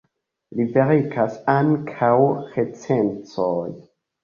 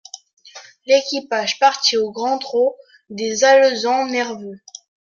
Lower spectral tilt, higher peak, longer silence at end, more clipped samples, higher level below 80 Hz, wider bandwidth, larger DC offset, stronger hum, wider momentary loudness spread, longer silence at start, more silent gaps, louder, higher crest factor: first, -8.5 dB/octave vs -1.5 dB/octave; about the same, -2 dBFS vs -2 dBFS; about the same, 0.45 s vs 0.55 s; neither; first, -60 dBFS vs -70 dBFS; about the same, 7.2 kHz vs 7.4 kHz; neither; neither; second, 9 LU vs 22 LU; first, 0.5 s vs 0.15 s; second, none vs 0.33-0.37 s; second, -21 LUFS vs -17 LUFS; about the same, 18 dB vs 18 dB